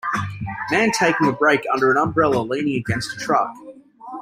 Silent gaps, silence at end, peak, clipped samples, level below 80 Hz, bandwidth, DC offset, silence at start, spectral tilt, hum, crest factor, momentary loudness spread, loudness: none; 0 s; -2 dBFS; under 0.1%; -52 dBFS; 16 kHz; under 0.1%; 0.05 s; -5 dB/octave; none; 18 dB; 10 LU; -19 LUFS